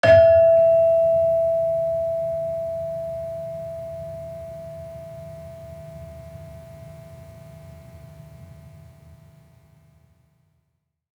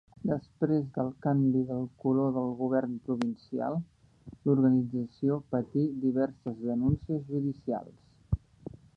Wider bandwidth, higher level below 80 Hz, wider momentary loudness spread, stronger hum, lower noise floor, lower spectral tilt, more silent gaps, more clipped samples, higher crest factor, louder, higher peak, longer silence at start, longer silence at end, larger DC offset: first, 8.4 kHz vs 5.6 kHz; about the same, -52 dBFS vs -52 dBFS; first, 27 LU vs 10 LU; neither; first, -74 dBFS vs -52 dBFS; second, -6.5 dB/octave vs -10.5 dB/octave; neither; neither; about the same, 18 dB vs 18 dB; first, -20 LUFS vs -31 LUFS; first, -4 dBFS vs -12 dBFS; second, 0.05 s vs 0.25 s; first, 2.5 s vs 0.2 s; neither